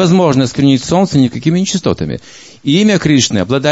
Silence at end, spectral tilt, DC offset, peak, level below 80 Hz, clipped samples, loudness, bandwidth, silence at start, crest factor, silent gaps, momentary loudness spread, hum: 0 s; -5.5 dB/octave; 0.3%; 0 dBFS; -42 dBFS; under 0.1%; -12 LUFS; 8 kHz; 0 s; 12 dB; none; 9 LU; none